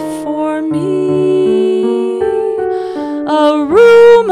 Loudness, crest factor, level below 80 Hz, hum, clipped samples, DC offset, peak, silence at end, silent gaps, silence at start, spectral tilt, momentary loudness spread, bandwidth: -11 LUFS; 10 dB; -48 dBFS; none; under 0.1%; under 0.1%; 0 dBFS; 0 s; none; 0 s; -6.5 dB/octave; 12 LU; 11.5 kHz